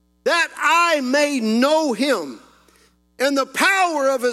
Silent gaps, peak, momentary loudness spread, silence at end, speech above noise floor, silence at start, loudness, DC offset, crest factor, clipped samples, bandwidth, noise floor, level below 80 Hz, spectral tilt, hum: none; -2 dBFS; 5 LU; 0 s; 38 dB; 0.25 s; -18 LUFS; under 0.1%; 18 dB; under 0.1%; 15.5 kHz; -56 dBFS; -68 dBFS; -2.5 dB/octave; none